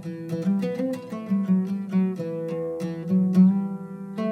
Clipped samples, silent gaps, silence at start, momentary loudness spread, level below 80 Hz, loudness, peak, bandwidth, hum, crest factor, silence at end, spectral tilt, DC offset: under 0.1%; none; 0 s; 13 LU; -72 dBFS; -25 LUFS; -8 dBFS; 6.2 kHz; none; 16 dB; 0 s; -9.5 dB/octave; under 0.1%